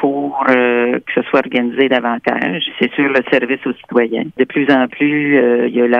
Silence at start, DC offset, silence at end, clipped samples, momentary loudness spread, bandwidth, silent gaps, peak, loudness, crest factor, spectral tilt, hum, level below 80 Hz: 0 s; under 0.1%; 0 s; under 0.1%; 5 LU; 5.8 kHz; none; 0 dBFS; -15 LUFS; 14 dB; -7 dB/octave; none; -62 dBFS